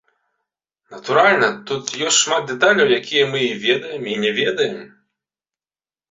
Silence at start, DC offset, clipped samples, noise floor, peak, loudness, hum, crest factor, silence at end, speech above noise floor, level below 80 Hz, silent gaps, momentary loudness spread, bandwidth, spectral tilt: 0.9 s; under 0.1%; under 0.1%; under -90 dBFS; -2 dBFS; -17 LUFS; none; 18 dB; 1.25 s; over 72 dB; -64 dBFS; none; 11 LU; 8 kHz; -2 dB/octave